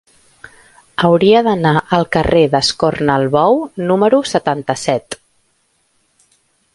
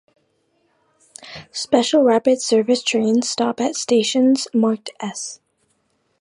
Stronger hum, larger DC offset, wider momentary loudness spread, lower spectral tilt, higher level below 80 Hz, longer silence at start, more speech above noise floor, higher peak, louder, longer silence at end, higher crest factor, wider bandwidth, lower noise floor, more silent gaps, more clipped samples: neither; neither; second, 7 LU vs 14 LU; first, -5.5 dB/octave vs -3.5 dB/octave; first, -42 dBFS vs -68 dBFS; second, 1 s vs 1.25 s; about the same, 48 dB vs 49 dB; about the same, 0 dBFS vs -2 dBFS; first, -14 LUFS vs -18 LUFS; first, 1.6 s vs 0.85 s; about the same, 14 dB vs 18 dB; about the same, 11.5 kHz vs 11.5 kHz; second, -61 dBFS vs -66 dBFS; neither; neither